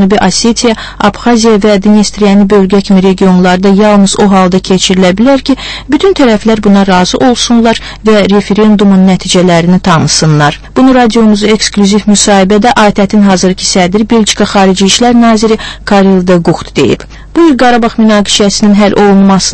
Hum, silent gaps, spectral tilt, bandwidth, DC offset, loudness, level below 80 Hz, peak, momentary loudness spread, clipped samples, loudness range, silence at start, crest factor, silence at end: none; none; -5 dB/octave; 11 kHz; under 0.1%; -6 LUFS; -30 dBFS; 0 dBFS; 5 LU; 3%; 1 LU; 0 s; 6 dB; 0 s